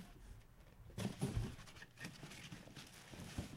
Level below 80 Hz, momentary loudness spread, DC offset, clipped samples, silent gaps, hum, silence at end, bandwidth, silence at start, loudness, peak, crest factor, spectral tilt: -58 dBFS; 18 LU; under 0.1%; under 0.1%; none; none; 0 s; 16 kHz; 0 s; -49 LUFS; -28 dBFS; 20 dB; -5 dB/octave